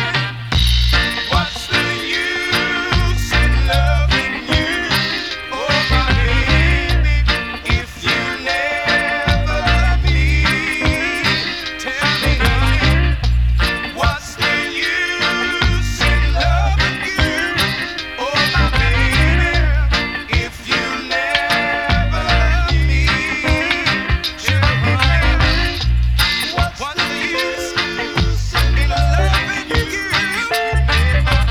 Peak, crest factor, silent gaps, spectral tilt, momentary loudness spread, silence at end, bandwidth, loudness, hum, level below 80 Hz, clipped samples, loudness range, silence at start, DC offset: 0 dBFS; 16 dB; none; -4.5 dB/octave; 5 LU; 0 s; 14 kHz; -16 LUFS; none; -20 dBFS; under 0.1%; 1 LU; 0 s; 0.3%